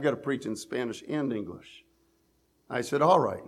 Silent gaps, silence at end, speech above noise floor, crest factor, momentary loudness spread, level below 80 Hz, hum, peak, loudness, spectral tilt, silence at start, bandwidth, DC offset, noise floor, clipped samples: none; 0 s; 41 dB; 22 dB; 13 LU; -70 dBFS; none; -8 dBFS; -29 LUFS; -5.5 dB/octave; 0 s; 14.5 kHz; under 0.1%; -69 dBFS; under 0.1%